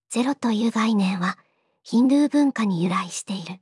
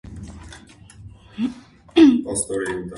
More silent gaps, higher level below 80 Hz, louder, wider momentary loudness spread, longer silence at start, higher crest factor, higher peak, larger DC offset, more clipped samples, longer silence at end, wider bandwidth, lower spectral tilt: neither; second, -84 dBFS vs -46 dBFS; second, -22 LUFS vs -19 LUFS; second, 11 LU vs 25 LU; about the same, 0.1 s vs 0.05 s; second, 14 dB vs 20 dB; second, -10 dBFS vs -2 dBFS; neither; neither; about the same, 0.05 s vs 0 s; about the same, 11.5 kHz vs 11.5 kHz; about the same, -5.5 dB/octave vs -4.5 dB/octave